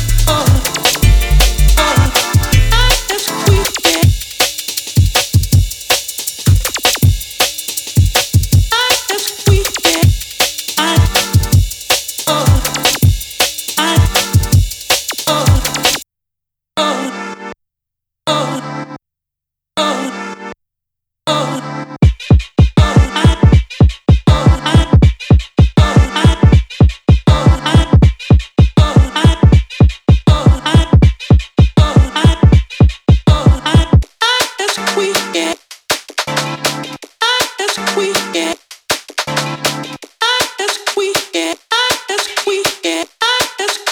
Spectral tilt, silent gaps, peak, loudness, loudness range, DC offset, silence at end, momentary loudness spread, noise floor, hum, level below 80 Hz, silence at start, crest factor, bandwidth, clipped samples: -4.5 dB/octave; none; 0 dBFS; -13 LUFS; 6 LU; under 0.1%; 0 s; 7 LU; -82 dBFS; none; -18 dBFS; 0 s; 12 dB; over 20 kHz; under 0.1%